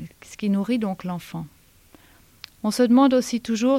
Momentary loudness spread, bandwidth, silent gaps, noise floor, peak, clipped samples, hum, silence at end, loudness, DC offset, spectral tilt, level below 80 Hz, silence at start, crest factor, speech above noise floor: 19 LU; 16 kHz; none; -54 dBFS; -6 dBFS; under 0.1%; none; 0 s; -22 LUFS; under 0.1%; -5.5 dB/octave; -60 dBFS; 0 s; 16 dB; 33 dB